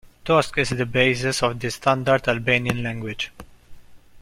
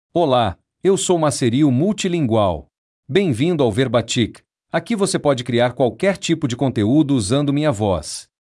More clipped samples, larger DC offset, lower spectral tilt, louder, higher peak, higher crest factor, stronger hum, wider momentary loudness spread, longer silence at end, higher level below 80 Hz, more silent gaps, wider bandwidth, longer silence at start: neither; neither; about the same, -4.5 dB/octave vs -5.5 dB/octave; second, -22 LUFS vs -18 LUFS; about the same, -2 dBFS vs -4 dBFS; first, 22 dB vs 14 dB; neither; first, 9 LU vs 6 LU; second, 0.05 s vs 0.35 s; about the same, -46 dBFS vs -50 dBFS; second, none vs 2.78-3.03 s; first, 16 kHz vs 12 kHz; about the same, 0.25 s vs 0.15 s